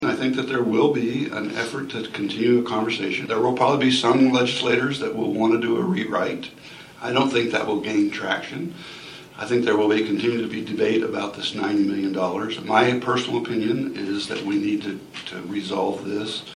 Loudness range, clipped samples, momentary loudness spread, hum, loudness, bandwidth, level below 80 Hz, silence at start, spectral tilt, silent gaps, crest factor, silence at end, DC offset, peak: 4 LU; under 0.1%; 12 LU; none; -22 LUFS; 12.5 kHz; -62 dBFS; 0 s; -5 dB/octave; none; 20 dB; 0 s; under 0.1%; -2 dBFS